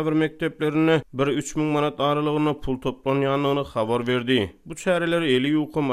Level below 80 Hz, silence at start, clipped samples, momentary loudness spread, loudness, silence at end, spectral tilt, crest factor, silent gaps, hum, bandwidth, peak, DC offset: -48 dBFS; 0 s; under 0.1%; 5 LU; -23 LUFS; 0 s; -6 dB/octave; 16 dB; none; none; 14 kHz; -6 dBFS; under 0.1%